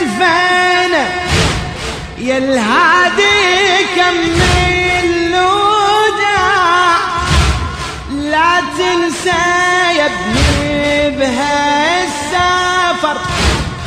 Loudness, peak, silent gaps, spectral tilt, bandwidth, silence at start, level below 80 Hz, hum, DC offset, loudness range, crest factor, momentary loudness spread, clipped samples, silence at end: -12 LUFS; 0 dBFS; none; -4 dB/octave; 15 kHz; 0 s; -26 dBFS; none; under 0.1%; 2 LU; 12 dB; 6 LU; under 0.1%; 0 s